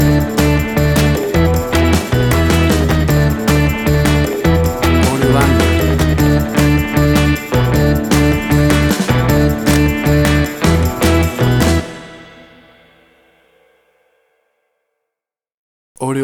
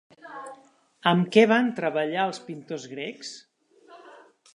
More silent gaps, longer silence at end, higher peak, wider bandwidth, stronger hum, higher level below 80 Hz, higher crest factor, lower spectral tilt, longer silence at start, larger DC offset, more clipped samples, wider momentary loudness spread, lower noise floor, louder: first, 15.54-15.95 s vs none; second, 0 s vs 0.45 s; first, 0 dBFS vs -4 dBFS; first, 19 kHz vs 11 kHz; neither; first, -22 dBFS vs -78 dBFS; second, 14 dB vs 24 dB; about the same, -6 dB/octave vs -5.5 dB/octave; second, 0 s vs 0.25 s; neither; neither; second, 2 LU vs 22 LU; first, -84 dBFS vs -54 dBFS; first, -13 LUFS vs -24 LUFS